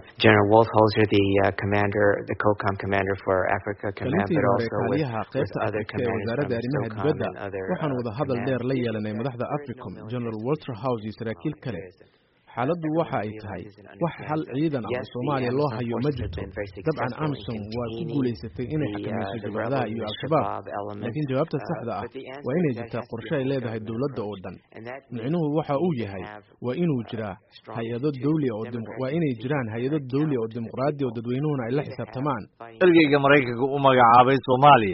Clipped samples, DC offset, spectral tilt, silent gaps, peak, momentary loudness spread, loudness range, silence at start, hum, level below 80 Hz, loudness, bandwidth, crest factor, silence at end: under 0.1%; under 0.1%; -5.5 dB/octave; none; -2 dBFS; 15 LU; 7 LU; 0 s; none; -54 dBFS; -25 LUFS; 5.8 kHz; 22 dB; 0 s